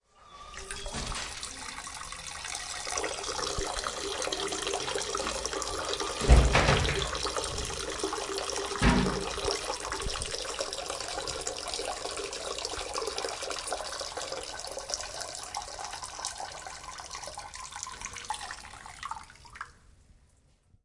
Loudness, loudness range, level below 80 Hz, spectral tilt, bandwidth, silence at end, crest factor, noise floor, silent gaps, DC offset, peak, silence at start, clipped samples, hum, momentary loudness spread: -32 LUFS; 11 LU; -38 dBFS; -3 dB/octave; 11.5 kHz; 1.15 s; 28 dB; -64 dBFS; none; under 0.1%; -6 dBFS; 0.2 s; under 0.1%; none; 14 LU